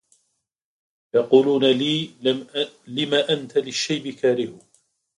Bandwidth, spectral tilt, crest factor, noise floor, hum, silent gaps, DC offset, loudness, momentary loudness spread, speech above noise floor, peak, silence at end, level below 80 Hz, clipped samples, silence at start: 11 kHz; -4.5 dB/octave; 20 dB; -73 dBFS; none; none; under 0.1%; -22 LUFS; 10 LU; 52 dB; -2 dBFS; 0.6 s; -70 dBFS; under 0.1%; 1.15 s